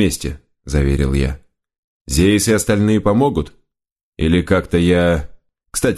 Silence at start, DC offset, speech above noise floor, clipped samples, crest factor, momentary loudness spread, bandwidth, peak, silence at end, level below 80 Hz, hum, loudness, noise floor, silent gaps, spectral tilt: 0 s; under 0.1%; 55 dB; under 0.1%; 16 dB; 11 LU; 13 kHz; 0 dBFS; 0 s; -28 dBFS; none; -16 LUFS; -70 dBFS; 1.78-2.05 s, 3.92-3.96 s, 4.03-4.13 s; -5.5 dB/octave